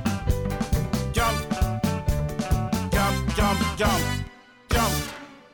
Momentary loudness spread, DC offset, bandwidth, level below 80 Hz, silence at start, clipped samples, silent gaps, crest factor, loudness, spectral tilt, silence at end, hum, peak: 6 LU; under 0.1%; 18 kHz; -30 dBFS; 0 s; under 0.1%; none; 12 dB; -25 LUFS; -5 dB/octave; 0.15 s; none; -12 dBFS